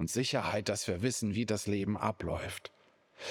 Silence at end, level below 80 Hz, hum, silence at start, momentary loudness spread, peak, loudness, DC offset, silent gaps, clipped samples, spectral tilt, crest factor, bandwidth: 0 s; -62 dBFS; none; 0 s; 11 LU; -16 dBFS; -34 LUFS; under 0.1%; none; under 0.1%; -4.5 dB/octave; 18 dB; 19.5 kHz